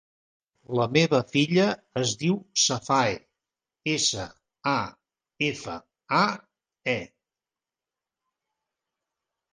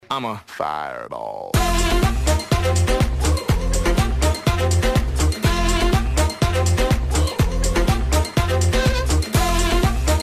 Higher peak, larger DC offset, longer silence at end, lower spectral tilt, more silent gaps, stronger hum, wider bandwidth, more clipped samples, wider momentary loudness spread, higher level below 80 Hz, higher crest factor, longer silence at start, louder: about the same, -6 dBFS vs -6 dBFS; neither; first, 2.45 s vs 0 s; second, -3.5 dB/octave vs -5 dB/octave; neither; neither; second, 10.5 kHz vs 15.5 kHz; neither; first, 16 LU vs 7 LU; second, -64 dBFS vs -22 dBFS; first, 22 dB vs 12 dB; first, 0.7 s vs 0.1 s; second, -25 LUFS vs -20 LUFS